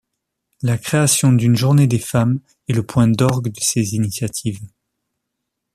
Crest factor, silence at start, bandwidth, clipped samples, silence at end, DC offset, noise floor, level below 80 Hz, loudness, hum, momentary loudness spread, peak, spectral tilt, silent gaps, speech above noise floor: 16 dB; 0.65 s; 14.5 kHz; under 0.1%; 1.1 s; under 0.1%; -78 dBFS; -50 dBFS; -17 LUFS; none; 11 LU; -2 dBFS; -5.5 dB/octave; none; 61 dB